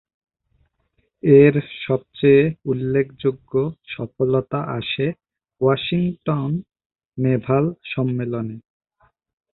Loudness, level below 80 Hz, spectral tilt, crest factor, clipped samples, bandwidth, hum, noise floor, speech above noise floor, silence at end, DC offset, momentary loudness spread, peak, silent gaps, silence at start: -20 LUFS; -54 dBFS; -12 dB/octave; 20 dB; under 0.1%; 4.2 kHz; none; -68 dBFS; 49 dB; 0.95 s; under 0.1%; 13 LU; -2 dBFS; 6.86-6.90 s; 1.25 s